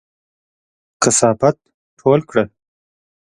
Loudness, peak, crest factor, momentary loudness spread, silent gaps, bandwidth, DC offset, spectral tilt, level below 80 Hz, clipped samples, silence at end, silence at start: -16 LUFS; 0 dBFS; 20 dB; 10 LU; 1.74-1.97 s; 11.5 kHz; under 0.1%; -4 dB/octave; -56 dBFS; under 0.1%; 0.8 s; 1 s